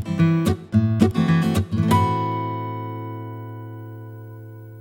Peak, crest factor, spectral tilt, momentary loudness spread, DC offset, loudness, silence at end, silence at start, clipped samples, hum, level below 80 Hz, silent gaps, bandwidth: -2 dBFS; 20 dB; -7.5 dB/octave; 19 LU; under 0.1%; -21 LUFS; 0 s; 0 s; under 0.1%; none; -46 dBFS; none; 16.5 kHz